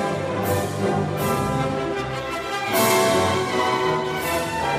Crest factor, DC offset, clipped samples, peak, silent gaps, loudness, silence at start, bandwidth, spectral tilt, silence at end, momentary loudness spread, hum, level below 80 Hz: 16 dB; under 0.1%; under 0.1%; -6 dBFS; none; -22 LUFS; 0 s; 15.5 kHz; -4.5 dB/octave; 0 s; 8 LU; none; -46 dBFS